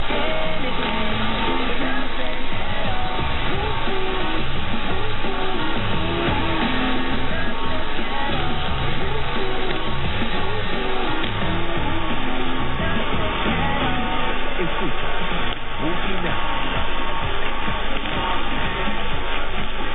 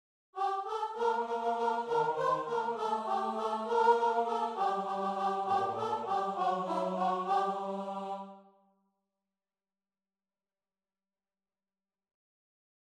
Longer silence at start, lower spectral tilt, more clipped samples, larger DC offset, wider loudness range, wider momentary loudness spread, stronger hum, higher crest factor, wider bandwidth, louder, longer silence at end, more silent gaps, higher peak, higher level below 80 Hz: second, 0 s vs 0.35 s; first, -8.5 dB/octave vs -5.5 dB/octave; neither; neither; second, 1 LU vs 8 LU; second, 4 LU vs 8 LU; neither; second, 10 dB vs 20 dB; second, 4.2 kHz vs 11.5 kHz; first, -24 LUFS vs -32 LUFS; second, 0 s vs 4.6 s; neither; first, -8 dBFS vs -14 dBFS; first, -30 dBFS vs -80 dBFS